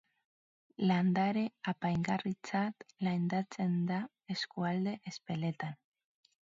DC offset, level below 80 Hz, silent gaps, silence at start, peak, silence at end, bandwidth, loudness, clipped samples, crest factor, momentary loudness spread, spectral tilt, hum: under 0.1%; -72 dBFS; none; 0.8 s; -18 dBFS; 0.75 s; 7.6 kHz; -35 LUFS; under 0.1%; 16 dB; 10 LU; -6 dB/octave; none